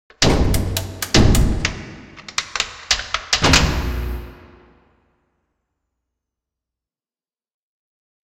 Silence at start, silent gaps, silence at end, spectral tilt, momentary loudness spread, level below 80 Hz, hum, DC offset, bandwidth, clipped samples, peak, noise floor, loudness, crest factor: 0.2 s; none; 4 s; -3.5 dB/octave; 16 LU; -26 dBFS; none; under 0.1%; 16.5 kHz; under 0.1%; 0 dBFS; under -90 dBFS; -18 LUFS; 20 dB